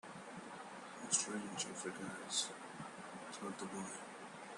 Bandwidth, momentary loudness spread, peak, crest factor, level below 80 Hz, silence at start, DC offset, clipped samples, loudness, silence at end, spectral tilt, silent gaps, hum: 12 kHz; 14 LU; -18 dBFS; 28 dB; -84 dBFS; 0.05 s; under 0.1%; under 0.1%; -43 LUFS; 0 s; -2 dB/octave; none; none